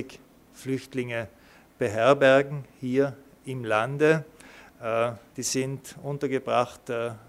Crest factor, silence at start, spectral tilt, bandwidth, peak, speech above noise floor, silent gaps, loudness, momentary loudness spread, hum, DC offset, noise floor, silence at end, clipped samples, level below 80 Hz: 20 dB; 0 s; -5 dB/octave; 16 kHz; -6 dBFS; 24 dB; none; -26 LUFS; 17 LU; none; under 0.1%; -50 dBFS; 0.1 s; under 0.1%; -64 dBFS